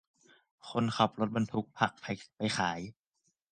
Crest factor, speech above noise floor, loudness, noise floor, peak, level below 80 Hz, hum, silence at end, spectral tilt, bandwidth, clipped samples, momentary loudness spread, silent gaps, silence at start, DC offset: 26 dB; 46 dB; -33 LUFS; -79 dBFS; -10 dBFS; -66 dBFS; none; 0.6 s; -5 dB/octave; 9.6 kHz; under 0.1%; 12 LU; none; 0.65 s; under 0.1%